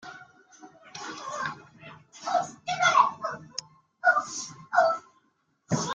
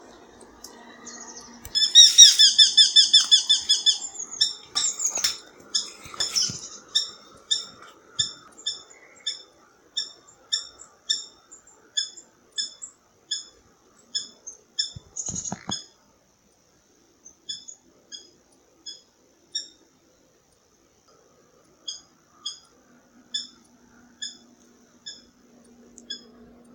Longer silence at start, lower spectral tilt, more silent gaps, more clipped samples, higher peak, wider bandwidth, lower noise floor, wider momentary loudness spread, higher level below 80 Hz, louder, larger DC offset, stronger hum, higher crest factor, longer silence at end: second, 0.05 s vs 0.65 s; first, -3 dB/octave vs 2 dB/octave; neither; neither; second, -6 dBFS vs 0 dBFS; second, 9.4 kHz vs 17 kHz; first, -71 dBFS vs -62 dBFS; second, 22 LU vs 28 LU; second, -72 dBFS vs -66 dBFS; second, -27 LUFS vs -19 LUFS; neither; neither; about the same, 22 dB vs 26 dB; second, 0 s vs 0.55 s